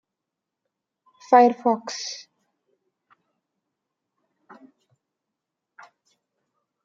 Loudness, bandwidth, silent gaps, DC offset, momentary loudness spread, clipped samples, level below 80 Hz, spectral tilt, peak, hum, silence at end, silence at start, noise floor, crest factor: -20 LUFS; 7.6 kHz; none; under 0.1%; 17 LU; under 0.1%; -86 dBFS; -3.5 dB/octave; -2 dBFS; none; 4.7 s; 1.3 s; -85 dBFS; 26 dB